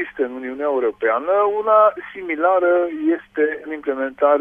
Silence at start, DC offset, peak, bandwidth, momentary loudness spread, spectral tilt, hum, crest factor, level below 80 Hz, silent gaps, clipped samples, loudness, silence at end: 0 s; under 0.1%; -2 dBFS; 3.7 kHz; 10 LU; -7 dB/octave; none; 16 dB; -62 dBFS; none; under 0.1%; -19 LUFS; 0 s